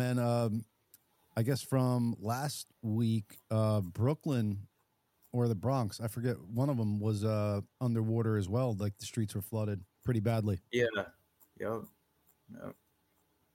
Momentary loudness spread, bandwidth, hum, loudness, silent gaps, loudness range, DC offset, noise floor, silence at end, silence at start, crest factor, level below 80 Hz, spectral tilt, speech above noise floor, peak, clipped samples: 9 LU; 16.5 kHz; none; -34 LUFS; none; 3 LU; under 0.1%; -77 dBFS; 0.85 s; 0 s; 16 dB; -68 dBFS; -7 dB/octave; 44 dB; -18 dBFS; under 0.1%